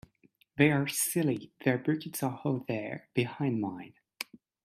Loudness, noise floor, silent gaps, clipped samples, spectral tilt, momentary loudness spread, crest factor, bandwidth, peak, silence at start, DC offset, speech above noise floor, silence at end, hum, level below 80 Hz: -31 LUFS; -67 dBFS; none; under 0.1%; -5 dB/octave; 16 LU; 22 dB; 15.5 kHz; -10 dBFS; 0.55 s; under 0.1%; 37 dB; 0.4 s; none; -70 dBFS